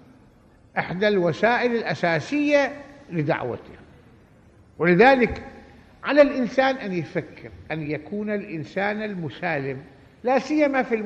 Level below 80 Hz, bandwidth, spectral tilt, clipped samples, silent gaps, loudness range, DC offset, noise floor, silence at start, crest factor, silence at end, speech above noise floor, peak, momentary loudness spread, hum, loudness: -54 dBFS; 8.4 kHz; -6.5 dB/octave; under 0.1%; none; 6 LU; under 0.1%; -54 dBFS; 0.75 s; 22 dB; 0 s; 31 dB; -2 dBFS; 15 LU; none; -23 LUFS